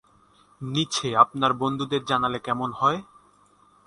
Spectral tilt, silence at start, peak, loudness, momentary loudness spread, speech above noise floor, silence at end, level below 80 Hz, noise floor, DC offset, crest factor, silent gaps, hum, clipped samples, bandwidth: -4.5 dB/octave; 0.6 s; -2 dBFS; -24 LUFS; 9 LU; 35 dB; 0.85 s; -60 dBFS; -59 dBFS; under 0.1%; 24 dB; none; 50 Hz at -55 dBFS; under 0.1%; 11.5 kHz